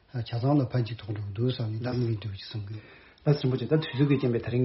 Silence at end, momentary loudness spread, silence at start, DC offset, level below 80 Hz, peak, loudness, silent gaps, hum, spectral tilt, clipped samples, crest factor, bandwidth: 0 s; 12 LU; 0.15 s; under 0.1%; -58 dBFS; -10 dBFS; -29 LUFS; none; none; -7 dB/octave; under 0.1%; 18 dB; 5.8 kHz